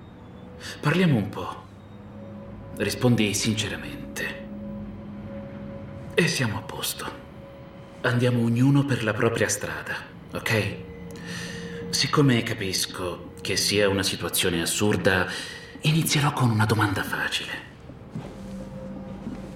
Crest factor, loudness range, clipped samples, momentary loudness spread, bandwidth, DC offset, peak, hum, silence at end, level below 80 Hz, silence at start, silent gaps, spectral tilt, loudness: 20 dB; 6 LU; under 0.1%; 19 LU; 17 kHz; under 0.1%; -6 dBFS; none; 0 s; -52 dBFS; 0 s; none; -4.5 dB/octave; -24 LUFS